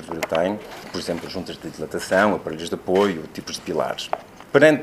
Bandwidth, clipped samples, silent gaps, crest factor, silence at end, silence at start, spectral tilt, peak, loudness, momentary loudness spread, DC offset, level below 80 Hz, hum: 15.5 kHz; under 0.1%; none; 22 dB; 0 s; 0 s; -5 dB/octave; 0 dBFS; -23 LUFS; 13 LU; under 0.1%; -56 dBFS; none